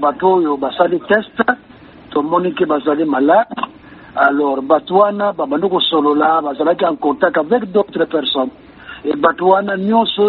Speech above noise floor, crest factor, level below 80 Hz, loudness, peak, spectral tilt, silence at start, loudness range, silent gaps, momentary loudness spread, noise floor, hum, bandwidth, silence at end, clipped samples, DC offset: 24 dB; 14 dB; -56 dBFS; -15 LUFS; 0 dBFS; -2.5 dB/octave; 0 s; 2 LU; none; 9 LU; -38 dBFS; none; 4.5 kHz; 0 s; under 0.1%; under 0.1%